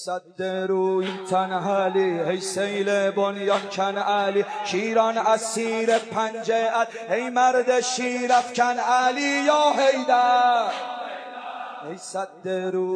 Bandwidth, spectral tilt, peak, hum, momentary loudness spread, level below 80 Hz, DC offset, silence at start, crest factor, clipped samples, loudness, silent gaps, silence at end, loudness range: 11 kHz; -3.5 dB/octave; -6 dBFS; none; 12 LU; -86 dBFS; under 0.1%; 0 s; 16 dB; under 0.1%; -22 LUFS; none; 0 s; 3 LU